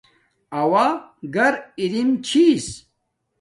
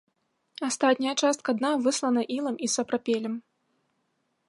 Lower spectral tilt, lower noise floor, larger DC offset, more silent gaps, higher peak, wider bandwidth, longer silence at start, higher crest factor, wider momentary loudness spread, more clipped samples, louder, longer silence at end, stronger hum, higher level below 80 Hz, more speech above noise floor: first, -4.5 dB/octave vs -2.5 dB/octave; about the same, -73 dBFS vs -75 dBFS; neither; neither; first, -4 dBFS vs -8 dBFS; about the same, 11.5 kHz vs 11.5 kHz; about the same, 0.5 s vs 0.6 s; about the same, 18 dB vs 20 dB; first, 14 LU vs 7 LU; neither; first, -20 LUFS vs -27 LUFS; second, 0.65 s vs 1.1 s; neither; first, -58 dBFS vs -80 dBFS; first, 54 dB vs 49 dB